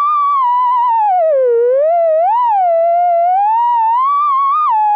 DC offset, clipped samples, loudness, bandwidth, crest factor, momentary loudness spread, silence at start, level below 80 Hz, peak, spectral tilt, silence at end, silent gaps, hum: under 0.1%; under 0.1%; -12 LUFS; 4.9 kHz; 4 dB; 0 LU; 0 s; -78 dBFS; -8 dBFS; -2 dB/octave; 0 s; none; none